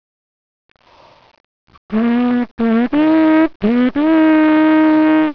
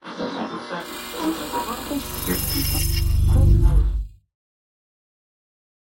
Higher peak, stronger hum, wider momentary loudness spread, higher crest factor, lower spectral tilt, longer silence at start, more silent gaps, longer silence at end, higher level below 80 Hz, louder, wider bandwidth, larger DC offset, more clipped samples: first, -2 dBFS vs -6 dBFS; neither; second, 6 LU vs 13 LU; about the same, 14 dB vs 16 dB; first, -8.5 dB/octave vs -5 dB/octave; first, 1.9 s vs 0.05 s; first, 2.51-2.58 s, 3.56-3.60 s vs none; second, 0 s vs 1.7 s; second, -50 dBFS vs -24 dBFS; first, -13 LUFS vs -23 LUFS; second, 5.4 kHz vs 17 kHz; neither; neither